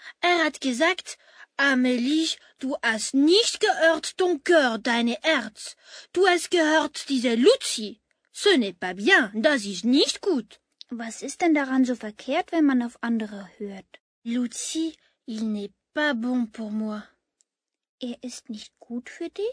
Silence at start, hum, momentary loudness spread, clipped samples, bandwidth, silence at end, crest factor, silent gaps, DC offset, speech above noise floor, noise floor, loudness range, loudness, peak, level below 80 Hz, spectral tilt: 0.05 s; none; 18 LU; under 0.1%; 11 kHz; 0 s; 20 dB; 14.00-14.22 s, 17.89-17.98 s; under 0.1%; 59 dB; -83 dBFS; 8 LU; -23 LUFS; -4 dBFS; -72 dBFS; -2.5 dB/octave